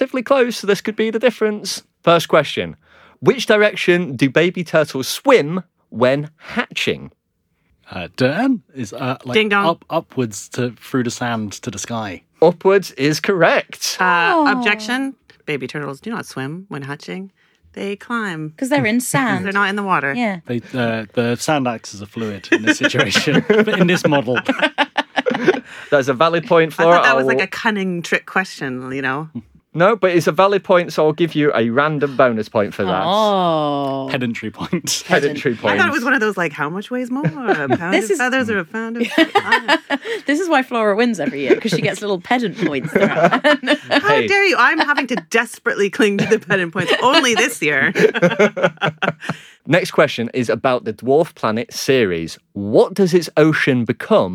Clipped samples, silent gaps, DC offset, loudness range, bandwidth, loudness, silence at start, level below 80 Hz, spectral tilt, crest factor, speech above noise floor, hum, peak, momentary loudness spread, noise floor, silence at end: under 0.1%; none; under 0.1%; 5 LU; 17 kHz; -17 LUFS; 0 s; -62 dBFS; -4.5 dB/octave; 16 dB; 50 dB; none; 0 dBFS; 12 LU; -67 dBFS; 0 s